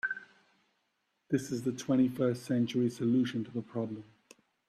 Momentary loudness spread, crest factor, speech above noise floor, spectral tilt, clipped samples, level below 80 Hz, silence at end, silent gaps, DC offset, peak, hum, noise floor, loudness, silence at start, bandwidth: 9 LU; 16 dB; 48 dB; -6.5 dB/octave; under 0.1%; -74 dBFS; 0.65 s; none; under 0.1%; -16 dBFS; none; -79 dBFS; -32 LUFS; 0.05 s; 13 kHz